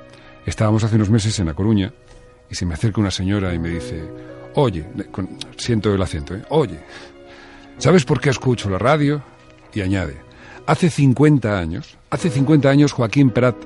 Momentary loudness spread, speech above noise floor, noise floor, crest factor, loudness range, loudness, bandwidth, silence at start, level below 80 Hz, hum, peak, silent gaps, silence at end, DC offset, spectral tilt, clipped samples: 15 LU; 23 dB; -41 dBFS; 16 dB; 5 LU; -19 LUFS; 11.5 kHz; 0 s; -40 dBFS; none; -2 dBFS; none; 0 s; under 0.1%; -6.5 dB/octave; under 0.1%